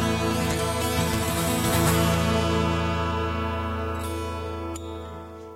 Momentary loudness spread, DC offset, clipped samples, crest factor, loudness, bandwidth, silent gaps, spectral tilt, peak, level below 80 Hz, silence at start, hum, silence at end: 12 LU; under 0.1%; under 0.1%; 16 dB; -25 LUFS; 17 kHz; none; -5 dB/octave; -10 dBFS; -38 dBFS; 0 s; none; 0 s